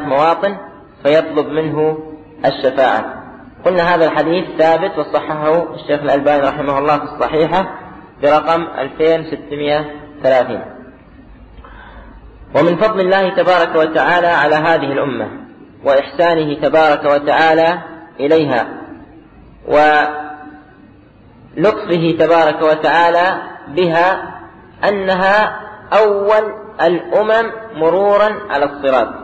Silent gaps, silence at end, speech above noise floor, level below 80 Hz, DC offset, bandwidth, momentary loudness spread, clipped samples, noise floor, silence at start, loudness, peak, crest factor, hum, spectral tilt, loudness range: none; 0 s; 30 dB; -46 dBFS; under 0.1%; 8.2 kHz; 13 LU; under 0.1%; -43 dBFS; 0 s; -14 LUFS; -2 dBFS; 12 dB; none; -6.5 dB/octave; 4 LU